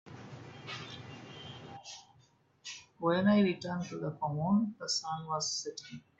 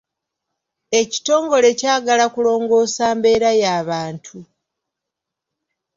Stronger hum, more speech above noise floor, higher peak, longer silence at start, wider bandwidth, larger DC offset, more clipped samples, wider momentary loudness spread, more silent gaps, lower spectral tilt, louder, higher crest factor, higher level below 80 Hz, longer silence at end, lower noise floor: neither; second, 34 dB vs 66 dB; second, -18 dBFS vs -2 dBFS; second, 0.05 s vs 0.9 s; about the same, 8 kHz vs 7.8 kHz; neither; neither; first, 20 LU vs 8 LU; neither; first, -5 dB/octave vs -3 dB/octave; second, -33 LUFS vs -16 LUFS; about the same, 18 dB vs 16 dB; second, -74 dBFS vs -60 dBFS; second, 0.2 s vs 1.55 s; second, -67 dBFS vs -83 dBFS